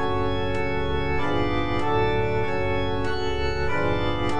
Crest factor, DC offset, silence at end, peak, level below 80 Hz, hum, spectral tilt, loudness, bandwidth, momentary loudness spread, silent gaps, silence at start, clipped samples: 14 dB; 4%; 0 s; -10 dBFS; -36 dBFS; none; -6.5 dB/octave; -25 LUFS; 10 kHz; 3 LU; none; 0 s; under 0.1%